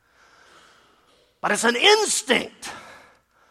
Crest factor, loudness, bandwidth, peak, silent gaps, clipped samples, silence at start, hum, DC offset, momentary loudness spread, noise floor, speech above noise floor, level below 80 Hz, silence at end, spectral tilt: 22 dB; -19 LUFS; 15.5 kHz; -4 dBFS; none; under 0.1%; 1.45 s; none; under 0.1%; 21 LU; -60 dBFS; 40 dB; -66 dBFS; 0.55 s; -1 dB/octave